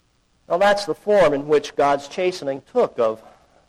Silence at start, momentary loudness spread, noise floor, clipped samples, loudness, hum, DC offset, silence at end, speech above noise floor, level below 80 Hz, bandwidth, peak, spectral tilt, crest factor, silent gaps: 0.5 s; 8 LU; -56 dBFS; under 0.1%; -20 LUFS; none; under 0.1%; 0.5 s; 36 dB; -54 dBFS; 13 kHz; -8 dBFS; -4.5 dB/octave; 12 dB; none